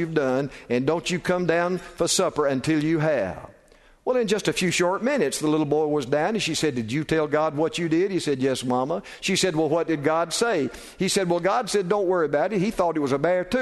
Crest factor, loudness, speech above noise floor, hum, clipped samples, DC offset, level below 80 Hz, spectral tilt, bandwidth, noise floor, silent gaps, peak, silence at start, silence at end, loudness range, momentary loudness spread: 16 dB; -23 LUFS; 31 dB; none; under 0.1%; under 0.1%; -54 dBFS; -4.5 dB/octave; 12.5 kHz; -55 dBFS; none; -6 dBFS; 0 s; 0 s; 1 LU; 4 LU